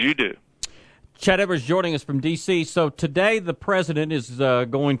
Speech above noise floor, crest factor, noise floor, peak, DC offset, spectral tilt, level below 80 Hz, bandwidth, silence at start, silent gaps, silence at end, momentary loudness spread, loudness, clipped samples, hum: 29 dB; 20 dB; -50 dBFS; -2 dBFS; under 0.1%; -5.5 dB/octave; -54 dBFS; 11 kHz; 0 s; none; 0 s; 6 LU; -22 LUFS; under 0.1%; none